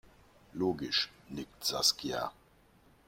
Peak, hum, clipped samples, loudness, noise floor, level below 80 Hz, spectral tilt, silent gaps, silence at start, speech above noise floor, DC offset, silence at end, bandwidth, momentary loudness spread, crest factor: -14 dBFS; none; under 0.1%; -32 LUFS; -64 dBFS; -64 dBFS; -2.5 dB/octave; none; 0.55 s; 30 dB; under 0.1%; 0.75 s; 16.5 kHz; 16 LU; 24 dB